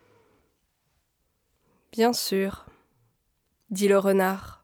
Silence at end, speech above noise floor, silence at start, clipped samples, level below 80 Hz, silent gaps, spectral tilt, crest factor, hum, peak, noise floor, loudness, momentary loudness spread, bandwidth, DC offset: 0.1 s; 49 dB; 1.95 s; under 0.1%; -62 dBFS; none; -4.5 dB/octave; 18 dB; none; -10 dBFS; -73 dBFS; -24 LUFS; 15 LU; over 20 kHz; under 0.1%